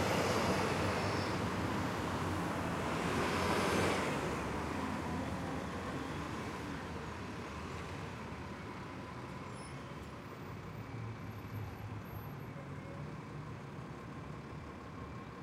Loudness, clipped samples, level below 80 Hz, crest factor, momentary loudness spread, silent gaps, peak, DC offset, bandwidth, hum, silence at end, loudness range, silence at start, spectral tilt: -39 LUFS; under 0.1%; -58 dBFS; 18 dB; 14 LU; none; -22 dBFS; under 0.1%; 16.5 kHz; none; 0 s; 11 LU; 0 s; -5 dB/octave